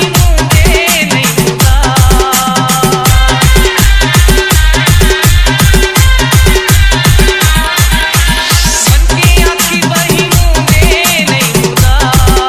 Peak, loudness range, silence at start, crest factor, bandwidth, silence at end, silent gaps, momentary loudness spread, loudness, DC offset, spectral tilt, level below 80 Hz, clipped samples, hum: 0 dBFS; 1 LU; 0 s; 6 dB; over 20 kHz; 0 s; none; 2 LU; -7 LUFS; under 0.1%; -3.5 dB/octave; -10 dBFS; 3%; none